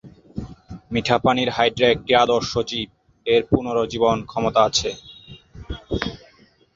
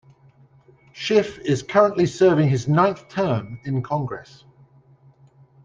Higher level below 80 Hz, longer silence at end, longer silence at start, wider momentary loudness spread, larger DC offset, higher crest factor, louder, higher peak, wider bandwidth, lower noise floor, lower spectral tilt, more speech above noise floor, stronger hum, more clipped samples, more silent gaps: first, -44 dBFS vs -58 dBFS; second, 0.6 s vs 1.4 s; second, 0.05 s vs 0.95 s; first, 19 LU vs 10 LU; neither; about the same, 20 dB vs 20 dB; about the same, -20 LUFS vs -21 LUFS; about the same, -2 dBFS vs -2 dBFS; second, 7.8 kHz vs 9.4 kHz; about the same, -54 dBFS vs -53 dBFS; second, -4.5 dB/octave vs -7 dB/octave; about the same, 35 dB vs 33 dB; neither; neither; neither